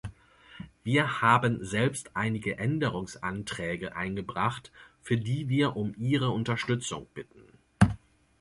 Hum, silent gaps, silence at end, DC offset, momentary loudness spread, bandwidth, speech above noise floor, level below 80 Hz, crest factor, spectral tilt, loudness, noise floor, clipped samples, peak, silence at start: none; none; 0.45 s; under 0.1%; 18 LU; 11.5 kHz; 26 dB; -52 dBFS; 24 dB; -5.5 dB/octave; -29 LUFS; -55 dBFS; under 0.1%; -6 dBFS; 0.05 s